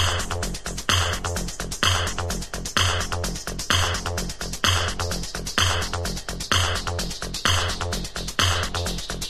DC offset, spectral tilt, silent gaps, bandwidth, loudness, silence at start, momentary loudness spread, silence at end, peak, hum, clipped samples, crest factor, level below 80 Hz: under 0.1%; -2.5 dB/octave; none; 14.5 kHz; -24 LUFS; 0 s; 8 LU; 0 s; -4 dBFS; none; under 0.1%; 22 dB; -32 dBFS